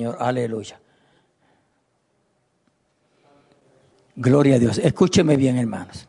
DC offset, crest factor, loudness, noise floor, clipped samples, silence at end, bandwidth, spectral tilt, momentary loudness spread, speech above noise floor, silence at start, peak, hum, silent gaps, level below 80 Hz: under 0.1%; 18 dB; -19 LUFS; -68 dBFS; under 0.1%; 0.05 s; 11 kHz; -6.5 dB/octave; 12 LU; 49 dB; 0 s; -4 dBFS; none; none; -56 dBFS